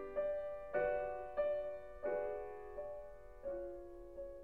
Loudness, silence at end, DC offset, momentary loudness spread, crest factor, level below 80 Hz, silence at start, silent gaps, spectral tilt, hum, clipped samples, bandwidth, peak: -43 LUFS; 0 s; 0.1%; 12 LU; 18 dB; -62 dBFS; 0 s; none; -7 dB/octave; none; under 0.1%; 4.5 kHz; -26 dBFS